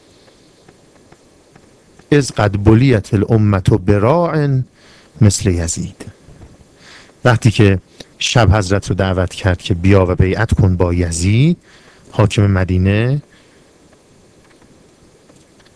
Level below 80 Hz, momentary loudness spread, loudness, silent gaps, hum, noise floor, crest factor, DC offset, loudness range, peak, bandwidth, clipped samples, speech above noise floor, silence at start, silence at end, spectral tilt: -34 dBFS; 9 LU; -14 LUFS; none; none; -48 dBFS; 16 dB; under 0.1%; 5 LU; 0 dBFS; 11 kHz; 0.2%; 35 dB; 2.1 s; 2.55 s; -6 dB/octave